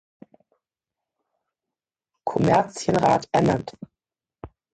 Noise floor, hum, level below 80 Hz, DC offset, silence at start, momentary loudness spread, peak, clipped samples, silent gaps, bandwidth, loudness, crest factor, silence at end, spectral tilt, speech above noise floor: -89 dBFS; none; -54 dBFS; under 0.1%; 2.25 s; 10 LU; -6 dBFS; under 0.1%; none; 9.2 kHz; -22 LUFS; 20 dB; 0.3 s; -6.5 dB/octave; 67 dB